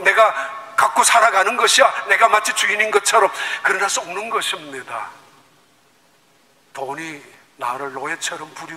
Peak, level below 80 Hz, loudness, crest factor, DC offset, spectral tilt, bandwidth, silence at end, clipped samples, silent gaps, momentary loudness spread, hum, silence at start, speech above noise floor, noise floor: 0 dBFS; -70 dBFS; -17 LUFS; 18 dB; under 0.1%; 0 dB/octave; 16 kHz; 0 s; under 0.1%; none; 17 LU; none; 0 s; 38 dB; -56 dBFS